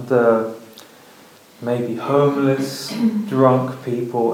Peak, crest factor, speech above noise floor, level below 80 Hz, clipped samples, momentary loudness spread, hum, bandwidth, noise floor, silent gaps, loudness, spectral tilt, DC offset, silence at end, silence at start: 0 dBFS; 18 dB; 28 dB; -76 dBFS; under 0.1%; 9 LU; none; 17 kHz; -46 dBFS; none; -19 LUFS; -7 dB/octave; under 0.1%; 0 s; 0 s